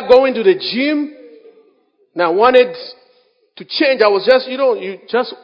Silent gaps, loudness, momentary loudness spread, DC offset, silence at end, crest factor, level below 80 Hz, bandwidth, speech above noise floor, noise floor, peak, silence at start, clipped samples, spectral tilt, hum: none; -14 LUFS; 14 LU; under 0.1%; 0.1 s; 16 dB; -58 dBFS; 5.4 kHz; 42 dB; -56 dBFS; 0 dBFS; 0 s; under 0.1%; -6 dB/octave; none